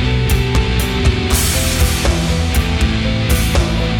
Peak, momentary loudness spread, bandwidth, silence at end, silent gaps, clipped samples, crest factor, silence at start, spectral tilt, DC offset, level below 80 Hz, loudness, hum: -2 dBFS; 2 LU; 17.5 kHz; 0 s; none; under 0.1%; 12 dB; 0 s; -4.5 dB/octave; under 0.1%; -18 dBFS; -15 LUFS; none